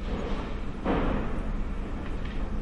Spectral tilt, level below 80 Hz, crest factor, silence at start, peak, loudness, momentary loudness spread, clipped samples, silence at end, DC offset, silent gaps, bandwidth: -7.5 dB/octave; -32 dBFS; 14 dB; 0 s; -14 dBFS; -33 LUFS; 7 LU; under 0.1%; 0 s; under 0.1%; none; 8.2 kHz